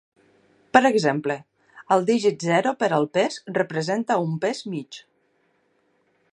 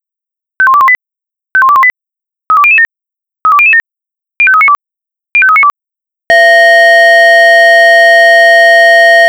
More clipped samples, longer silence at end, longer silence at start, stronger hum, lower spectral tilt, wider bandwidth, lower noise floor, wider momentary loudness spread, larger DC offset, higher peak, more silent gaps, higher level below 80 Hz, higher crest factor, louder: second, under 0.1% vs 6%; first, 1.3 s vs 0 s; first, 0.75 s vs 0.6 s; neither; first, -5.5 dB/octave vs 0.5 dB/octave; second, 11.5 kHz vs over 20 kHz; second, -67 dBFS vs -84 dBFS; first, 13 LU vs 8 LU; neither; about the same, 0 dBFS vs 0 dBFS; neither; second, -72 dBFS vs -56 dBFS; first, 24 dB vs 6 dB; second, -22 LUFS vs -4 LUFS